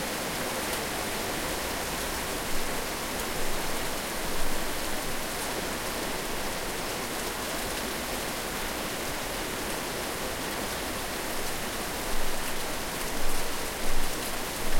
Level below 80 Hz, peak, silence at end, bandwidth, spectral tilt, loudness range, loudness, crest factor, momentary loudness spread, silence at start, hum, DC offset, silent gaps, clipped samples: -38 dBFS; -12 dBFS; 0 s; 16.5 kHz; -2.5 dB/octave; 1 LU; -31 LUFS; 18 dB; 1 LU; 0 s; none; under 0.1%; none; under 0.1%